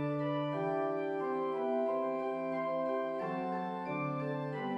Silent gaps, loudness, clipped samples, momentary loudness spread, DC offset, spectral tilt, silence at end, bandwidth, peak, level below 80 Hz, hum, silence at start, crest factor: none; -35 LUFS; under 0.1%; 4 LU; under 0.1%; -8.5 dB/octave; 0 s; 8 kHz; -22 dBFS; -76 dBFS; none; 0 s; 12 dB